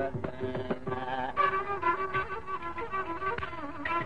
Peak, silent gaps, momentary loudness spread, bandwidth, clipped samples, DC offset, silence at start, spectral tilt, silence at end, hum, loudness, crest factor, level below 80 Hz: -16 dBFS; none; 8 LU; 10 kHz; under 0.1%; 0.7%; 0 s; -7 dB/octave; 0 s; none; -33 LUFS; 16 dB; -54 dBFS